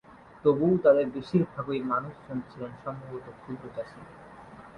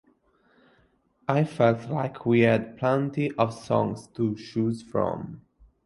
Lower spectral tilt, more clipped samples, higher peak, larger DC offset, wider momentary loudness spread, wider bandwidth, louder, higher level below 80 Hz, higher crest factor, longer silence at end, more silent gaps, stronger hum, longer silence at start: first, -9.5 dB/octave vs -8 dB/octave; neither; second, -10 dBFS vs -6 dBFS; neither; first, 24 LU vs 8 LU; second, 8.8 kHz vs 11.5 kHz; about the same, -28 LUFS vs -26 LUFS; about the same, -62 dBFS vs -60 dBFS; about the same, 20 dB vs 20 dB; second, 0 s vs 0.5 s; neither; neither; second, 0.15 s vs 1.3 s